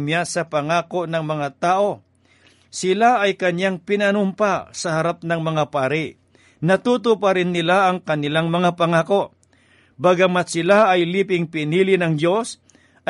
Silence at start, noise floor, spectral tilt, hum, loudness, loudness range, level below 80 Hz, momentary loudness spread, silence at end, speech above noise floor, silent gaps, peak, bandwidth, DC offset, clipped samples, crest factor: 0 s; -56 dBFS; -5.5 dB/octave; none; -19 LUFS; 3 LU; -64 dBFS; 8 LU; 0.55 s; 37 dB; none; -4 dBFS; 11.5 kHz; under 0.1%; under 0.1%; 16 dB